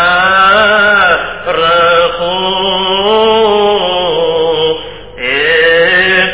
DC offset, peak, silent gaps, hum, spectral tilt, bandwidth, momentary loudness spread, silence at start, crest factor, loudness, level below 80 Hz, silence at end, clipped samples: 0.9%; 0 dBFS; none; none; -7 dB/octave; 4 kHz; 7 LU; 0 s; 10 dB; -9 LUFS; -38 dBFS; 0 s; 0.1%